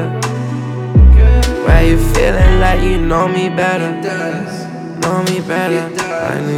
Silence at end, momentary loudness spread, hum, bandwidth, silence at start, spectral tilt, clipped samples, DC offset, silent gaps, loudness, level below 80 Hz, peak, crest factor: 0 s; 11 LU; none; 14.5 kHz; 0 s; -6 dB/octave; under 0.1%; under 0.1%; none; -14 LUFS; -14 dBFS; 0 dBFS; 12 dB